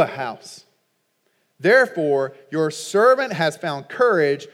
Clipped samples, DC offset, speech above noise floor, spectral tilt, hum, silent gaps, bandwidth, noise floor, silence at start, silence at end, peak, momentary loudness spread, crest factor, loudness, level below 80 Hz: under 0.1%; under 0.1%; 49 dB; -4.5 dB/octave; none; none; 15 kHz; -69 dBFS; 0 s; 0.1 s; -2 dBFS; 12 LU; 18 dB; -19 LUFS; -86 dBFS